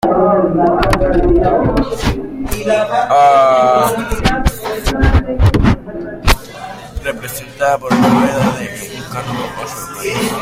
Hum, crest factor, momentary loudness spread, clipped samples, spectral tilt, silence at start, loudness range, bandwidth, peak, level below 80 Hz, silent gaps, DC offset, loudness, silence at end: none; 14 dB; 14 LU; under 0.1%; -6 dB/octave; 0.05 s; 4 LU; 16.5 kHz; 0 dBFS; -22 dBFS; none; under 0.1%; -14 LUFS; 0 s